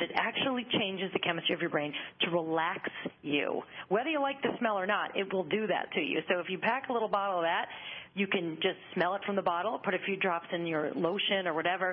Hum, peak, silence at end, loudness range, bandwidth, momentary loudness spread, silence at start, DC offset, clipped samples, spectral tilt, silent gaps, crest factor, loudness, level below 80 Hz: none; -14 dBFS; 0 s; 1 LU; 5.8 kHz; 4 LU; 0 s; under 0.1%; under 0.1%; -8.5 dB/octave; none; 18 dB; -32 LUFS; -76 dBFS